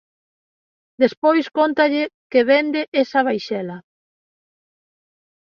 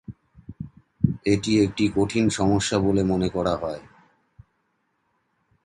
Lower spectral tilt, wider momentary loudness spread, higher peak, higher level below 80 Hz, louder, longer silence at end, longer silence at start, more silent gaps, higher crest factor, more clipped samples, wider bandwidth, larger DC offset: about the same, -6 dB/octave vs -6 dB/octave; second, 11 LU vs 19 LU; about the same, -2 dBFS vs -4 dBFS; second, -70 dBFS vs -46 dBFS; first, -19 LUFS vs -23 LUFS; about the same, 1.75 s vs 1.85 s; first, 1 s vs 0.1 s; first, 1.17-1.22 s, 2.14-2.30 s, 2.88-2.92 s vs none; about the same, 18 dB vs 20 dB; neither; second, 7 kHz vs 11.5 kHz; neither